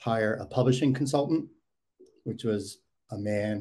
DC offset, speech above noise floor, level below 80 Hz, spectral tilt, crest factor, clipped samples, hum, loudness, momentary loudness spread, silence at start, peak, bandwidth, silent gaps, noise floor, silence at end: under 0.1%; 34 dB; -66 dBFS; -6.5 dB/octave; 18 dB; under 0.1%; none; -29 LUFS; 17 LU; 0 s; -12 dBFS; 12.5 kHz; none; -61 dBFS; 0 s